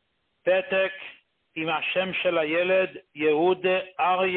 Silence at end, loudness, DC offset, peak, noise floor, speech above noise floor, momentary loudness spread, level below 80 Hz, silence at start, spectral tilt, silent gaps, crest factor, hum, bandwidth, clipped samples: 0 s; -25 LUFS; under 0.1%; -12 dBFS; -51 dBFS; 27 dB; 9 LU; -70 dBFS; 0.45 s; -9 dB/octave; none; 14 dB; none; 4.3 kHz; under 0.1%